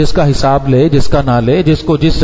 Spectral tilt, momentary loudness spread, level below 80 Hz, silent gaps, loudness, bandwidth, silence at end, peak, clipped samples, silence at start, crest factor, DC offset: -7 dB/octave; 2 LU; -22 dBFS; none; -11 LUFS; 7.8 kHz; 0 s; 0 dBFS; under 0.1%; 0 s; 10 dB; under 0.1%